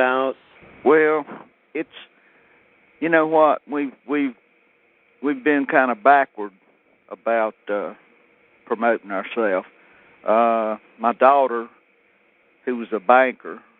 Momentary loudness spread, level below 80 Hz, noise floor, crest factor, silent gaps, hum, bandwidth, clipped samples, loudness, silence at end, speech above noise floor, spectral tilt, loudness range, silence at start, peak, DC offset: 17 LU; -74 dBFS; -60 dBFS; 20 dB; none; none; 4.1 kHz; under 0.1%; -20 LUFS; 0.2 s; 40 dB; -3 dB/octave; 5 LU; 0 s; 0 dBFS; under 0.1%